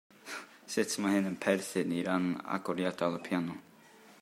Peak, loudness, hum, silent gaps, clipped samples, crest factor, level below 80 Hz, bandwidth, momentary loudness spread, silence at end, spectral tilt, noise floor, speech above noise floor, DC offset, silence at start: -12 dBFS; -33 LUFS; none; none; under 0.1%; 22 dB; -80 dBFS; 16 kHz; 13 LU; 0.05 s; -5 dB/octave; -58 dBFS; 25 dB; under 0.1%; 0.25 s